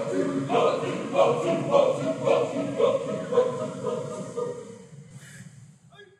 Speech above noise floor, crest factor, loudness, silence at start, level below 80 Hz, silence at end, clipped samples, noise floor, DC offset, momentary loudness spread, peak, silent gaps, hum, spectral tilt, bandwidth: 28 dB; 18 dB; -25 LUFS; 0 s; -70 dBFS; 0.15 s; under 0.1%; -52 dBFS; under 0.1%; 23 LU; -8 dBFS; none; none; -6 dB/octave; 11.5 kHz